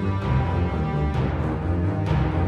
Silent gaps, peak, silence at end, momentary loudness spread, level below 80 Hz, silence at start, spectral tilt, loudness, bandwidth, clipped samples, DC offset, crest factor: none; -10 dBFS; 0 s; 2 LU; -30 dBFS; 0 s; -9 dB/octave; -24 LUFS; 6.8 kHz; under 0.1%; under 0.1%; 14 dB